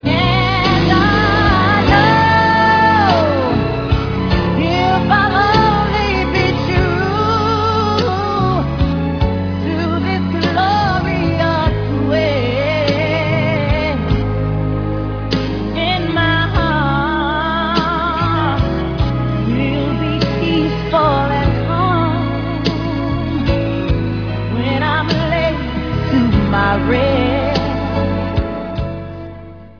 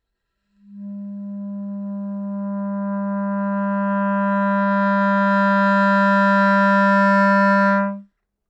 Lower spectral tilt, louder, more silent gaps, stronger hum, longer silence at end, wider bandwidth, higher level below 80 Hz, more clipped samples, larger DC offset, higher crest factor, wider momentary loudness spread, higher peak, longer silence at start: about the same, -7 dB/octave vs -8 dB/octave; first, -15 LUFS vs -18 LUFS; neither; neither; second, 0.05 s vs 0.45 s; second, 5.4 kHz vs 7.8 kHz; first, -26 dBFS vs -78 dBFS; neither; neither; about the same, 14 dB vs 12 dB; second, 7 LU vs 16 LU; first, 0 dBFS vs -6 dBFS; second, 0 s vs 0.7 s